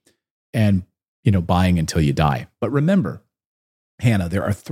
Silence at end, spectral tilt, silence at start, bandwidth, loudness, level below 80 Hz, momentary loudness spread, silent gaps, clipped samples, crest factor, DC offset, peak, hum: 0 s; -7 dB/octave; 0.55 s; 15.5 kHz; -20 LUFS; -40 dBFS; 7 LU; 1.08-1.23 s, 3.45-3.98 s; under 0.1%; 18 dB; under 0.1%; -2 dBFS; none